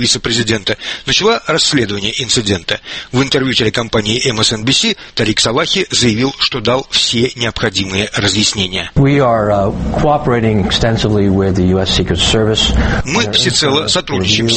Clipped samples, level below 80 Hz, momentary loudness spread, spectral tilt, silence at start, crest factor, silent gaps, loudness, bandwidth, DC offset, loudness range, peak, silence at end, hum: under 0.1%; -28 dBFS; 5 LU; -4 dB/octave; 0 s; 14 dB; none; -13 LUFS; 8.8 kHz; under 0.1%; 1 LU; 0 dBFS; 0 s; none